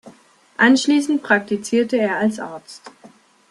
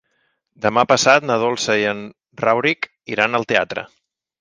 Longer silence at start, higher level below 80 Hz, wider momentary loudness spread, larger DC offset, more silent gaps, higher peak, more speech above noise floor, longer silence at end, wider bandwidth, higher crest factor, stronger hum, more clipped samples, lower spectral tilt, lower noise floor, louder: second, 0.05 s vs 0.6 s; second, -66 dBFS vs -60 dBFS; first, 22 LU vs 14 LU; neither; neither; about the same, -2 dBFS vs 0 dBFS; second, 32 dB vs 50 dB; about the same, 0.6 s vs 0.55 s; first, 12 kHz vs 10.5 kHz; about the same, 18 dB vs 20 dB; neither; neither; about the same, -4 dB/octave vs -3.5 dB/octave; second, -50 dBFS vs -68 dBFS; about the same, -18 LUFS vs -18 LUFS